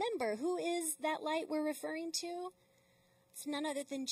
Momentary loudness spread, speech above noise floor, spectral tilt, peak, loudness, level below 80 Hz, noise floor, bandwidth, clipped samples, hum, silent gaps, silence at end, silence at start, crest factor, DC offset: 9 LU; 32 dB; -2 dB/octave; -24 dBFS; -38 LUFS; -88 dBFS; -71 dBFS; 15.5 kHz; under 0.1%; none; none; 0 s; 0 s; 16 dB; under 0.1%